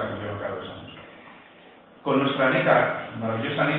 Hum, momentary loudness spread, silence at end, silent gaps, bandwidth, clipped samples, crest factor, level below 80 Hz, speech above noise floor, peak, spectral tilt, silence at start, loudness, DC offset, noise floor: none; 21 LU; 0 s; none; 4.6 kHz; under 0.1%; 22 dB; -62 dBFS; 28 dB; -4 dBFS; -9.5 dB/octave; 0 s; -24 LUFS; under 0.1%; -50 dBFS